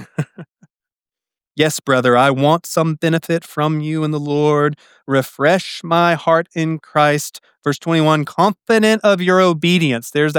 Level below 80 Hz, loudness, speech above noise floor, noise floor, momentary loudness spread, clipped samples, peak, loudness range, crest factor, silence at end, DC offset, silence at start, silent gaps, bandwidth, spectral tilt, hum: -68 dBFS; -16 LUFS; 74 dB; -90 dBFS; 8 LU; under 0.1%; -2 dBFS; 2 LU; 16 dB; 0 s; under 0.1%; 0 s; none; 19 kHz; -5.5 dB/octave; none